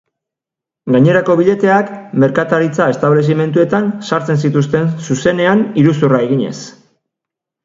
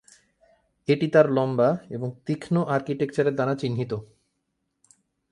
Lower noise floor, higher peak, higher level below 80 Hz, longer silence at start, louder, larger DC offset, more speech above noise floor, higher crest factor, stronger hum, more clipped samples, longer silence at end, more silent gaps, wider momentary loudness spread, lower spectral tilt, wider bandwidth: first, -85 dBFS vs -77 dBFS; first, 0 dBFS vs -6 dBFS; first, -54 dBFS vs -64 dBFS; about the same, 0.85 s vs 0.9 s; first, -13 LUFS vs -24 LUFS; neither; first, 72 dB vs 53 dB; second, 14 dB vs 20 dB; neither; neither; second, 0.95 s vs 1.25 s; neither; second, 7 LU vs 13 LU; about the same, -7 dB/octave vs -7.5 dB/octave; second, 7.8 kHz vs 11 kHz